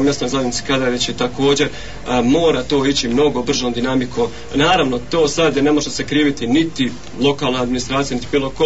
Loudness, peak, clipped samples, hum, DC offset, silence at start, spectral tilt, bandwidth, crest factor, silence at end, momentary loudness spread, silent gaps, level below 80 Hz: -17 LUFS; -4 dBFS; under 0.1%; none; 3%; 0 s; -4.5 dB/octave; 8 kHz; 14 dB; 0 s; 6 LU; none; -38 dBFS